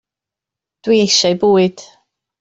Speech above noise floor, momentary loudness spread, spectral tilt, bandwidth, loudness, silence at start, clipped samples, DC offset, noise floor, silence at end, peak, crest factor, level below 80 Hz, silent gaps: 73 dB; 7 LU; -4 dB/octave; 8 kHz; -13 LUFS; 0.85 s; under 0.1%; under 0.1%; -86 dBFS; 0.6 s; -2 dBFS; 14 dB; -58 dBFS; none